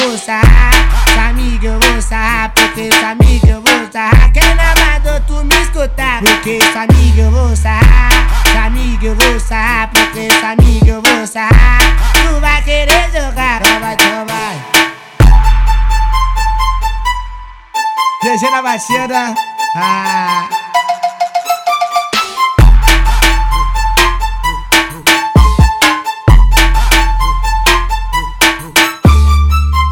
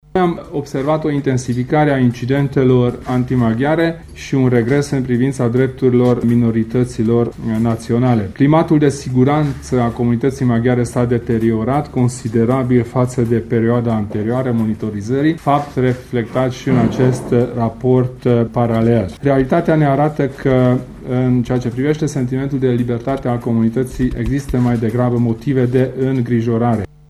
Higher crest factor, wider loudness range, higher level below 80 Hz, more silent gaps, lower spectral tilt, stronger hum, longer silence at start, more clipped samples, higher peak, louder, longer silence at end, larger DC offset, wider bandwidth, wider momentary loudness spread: second, 8 dB vs 14 dB; first, 5 LU vs 2 LU; first, -12 dBFS vs -38 dBFS; neither; second, -4 dB/octave vs -8 dB/octave; neither; second, 0 s vs 0.15 s; first, 0.9% vs under 0.1%; about the same, 0 dBFS vs 0 dBFS; first, -10 LUFS vs -16 LUFS; second, 0 s vs 0.25 s; neither; first, 17.5 kHz vs 12.5 kHz; about the same, 7 LU vs 5 LU